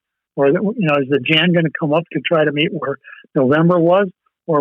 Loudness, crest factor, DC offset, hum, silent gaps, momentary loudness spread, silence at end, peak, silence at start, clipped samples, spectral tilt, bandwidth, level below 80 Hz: -16 LUFS; 12 dB; under 0.1%; none; none; 11 LU; 0 s; -4 dBFS; 0.35 s; under 0.1%; -8.5 dB/octave; 4.3 kHz; -68 dBFS